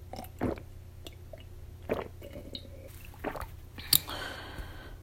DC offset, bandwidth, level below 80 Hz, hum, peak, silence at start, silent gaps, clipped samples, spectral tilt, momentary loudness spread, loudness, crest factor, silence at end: under 0.1%; 16.5 kHz; -48 dBFS; none; 0 dBFS; 0 s; none; under 0.1%; -3 dB/octave; 22 LU; -34 LUFS; 36 dB; 0 s